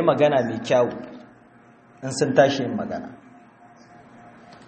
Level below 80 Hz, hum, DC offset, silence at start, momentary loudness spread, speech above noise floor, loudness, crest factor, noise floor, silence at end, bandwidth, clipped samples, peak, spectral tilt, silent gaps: -64 dBFS; none; under 0.1%; 0 s; 18 LU; 31 dB; -22 LUFS; 22 dB; -52 dBFS; 1.5 s; 8.4 kHz; under 0.1%; -2 dBFS; -5.5 dB/octave; none